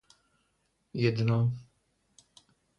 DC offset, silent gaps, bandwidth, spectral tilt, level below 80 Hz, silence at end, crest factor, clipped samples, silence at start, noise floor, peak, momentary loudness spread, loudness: under 0.1%; none; 8.4 kHz; -8 dB/octave; -64 dBFS; 1.15 s; 20 dB; under 0.1%; 0.95 s; -75 dBFS; -14 dBFS; 15 LU; -29 LUFS